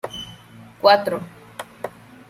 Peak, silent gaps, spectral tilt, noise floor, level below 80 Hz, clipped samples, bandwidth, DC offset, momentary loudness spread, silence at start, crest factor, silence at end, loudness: -2 dBFS; none; -4 dB/octave; -44 dBFS; -60 dBFS; under 0.1%; 15.5 kHz; under 0.1%; 21 LU; 0.05 s; 22 dB; 0.4 s; -19 LUFS